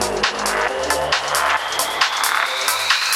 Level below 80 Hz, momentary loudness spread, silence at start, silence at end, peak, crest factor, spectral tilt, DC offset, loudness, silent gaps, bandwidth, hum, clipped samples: -46 dBFS; 3 LU; 0 s; 0 s; 0 dBFS; 18 dB; -0.5 dB/octave; under 0.1%; -18 LUFS; none; 16.5 kHz; none; under 0.1%